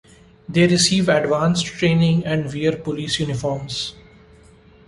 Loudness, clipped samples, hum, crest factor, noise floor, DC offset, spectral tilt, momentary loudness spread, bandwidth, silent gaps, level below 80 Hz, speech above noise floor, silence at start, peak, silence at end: -19 LUFS; under 0.1%; none; 18 dB; -48 dBFS; under 0.1%; -5 dB/octave; 10 LU; 11.5 kHz; none; -48 dBFS; 30 dB; 0.5 s; -2 dBFS; 0.9 s